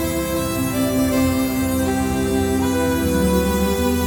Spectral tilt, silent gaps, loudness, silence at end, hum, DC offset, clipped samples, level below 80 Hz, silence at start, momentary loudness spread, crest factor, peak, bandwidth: -5.5 dB/octave; none; -19 LUFS; 0 s; none; under 0.1%; under 0.1%; -32 dBFS; 0 s; 3 LU; 14 dB; -6 dBFS; over 20 kHz